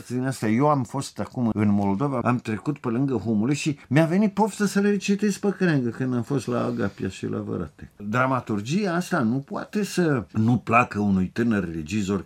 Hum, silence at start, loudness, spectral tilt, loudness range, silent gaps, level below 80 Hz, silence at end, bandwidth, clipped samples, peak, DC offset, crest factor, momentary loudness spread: none; 0 s; -24 LUFS; -6.5 dB/octave; 3 LU; none; -56 dBFS; 0 s; 15 kHz; under 0.1%; -4 dBFS; under 0.1%; 20 dB; 8 LU